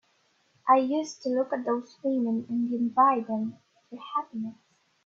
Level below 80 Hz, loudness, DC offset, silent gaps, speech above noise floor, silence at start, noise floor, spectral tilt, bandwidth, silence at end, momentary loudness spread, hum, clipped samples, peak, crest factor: -78 dBFS; -27 LUFS; under 0.1%; none; 41 dB; 0.65 s; -68 dBFS; -6 dB/octave; 7.8 kHz; 0.55 s; 14 LU; none; under 0.1%; -8 dBFS; 20 dB